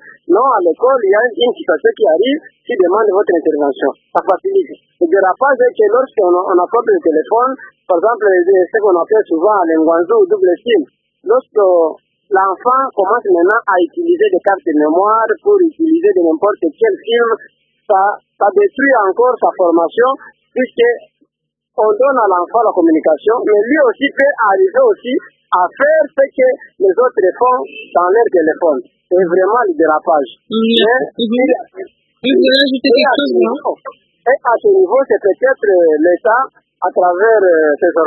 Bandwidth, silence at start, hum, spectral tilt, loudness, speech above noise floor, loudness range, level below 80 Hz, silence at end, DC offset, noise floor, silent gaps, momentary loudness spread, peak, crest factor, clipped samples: 5.4 kHz; 0.05 s; none; -6.5 dB/octave; -12 LUFS; 61 dB; 2 LU; -66 dBFS; 0 s; under 0.1%; -73 dBFS; none; 6 LU; 0 dBFS; 12 dB; under 0.1%